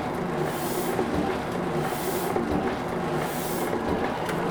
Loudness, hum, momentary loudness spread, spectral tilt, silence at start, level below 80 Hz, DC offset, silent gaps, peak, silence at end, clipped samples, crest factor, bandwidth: -27 LUFS; none; 2 LU; -5.5 dB/octave; 0 s; -48 dBFS; under 0.1%; none; -12 dBFS; 0 s; under 0.1%; 16 dB; over 20 kHz